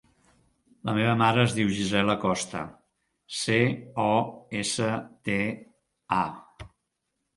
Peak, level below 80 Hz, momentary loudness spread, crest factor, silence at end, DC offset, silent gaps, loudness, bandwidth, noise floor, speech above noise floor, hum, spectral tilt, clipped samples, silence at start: -6 dBFS; -58 dBFS; 13 LU; 22 dB; 0.7 s; under 0.1%; none; -26 LUFS; 11.5 kHz; -80 dBFS; 54 dB; none; -5 dB/octave; under 0.1%; 0.85 s